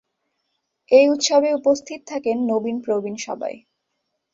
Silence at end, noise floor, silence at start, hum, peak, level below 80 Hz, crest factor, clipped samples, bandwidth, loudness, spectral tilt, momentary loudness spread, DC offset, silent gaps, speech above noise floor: 0.75 s; -76 dBFS; 0.9 s; none; -2 dBFS; -68 dBFS; 18 dB; under 0.1%; 7.8 kHz; -20 LUFS; -3 dB/octave; 14 LU; under 0.1%; none; 57 dB